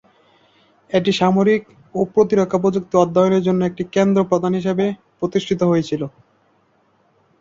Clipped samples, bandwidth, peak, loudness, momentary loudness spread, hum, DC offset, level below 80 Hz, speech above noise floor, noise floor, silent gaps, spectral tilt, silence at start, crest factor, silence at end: under 0.1%; 7.6 kHz; -2 dBFS; -18 LUFS; 8 LU; none; under 0.1%; -56 dBFS; 43 dB; -60 dBFS; none; -7 dB/octave; 0.9 s; 16 dB; 1.3 s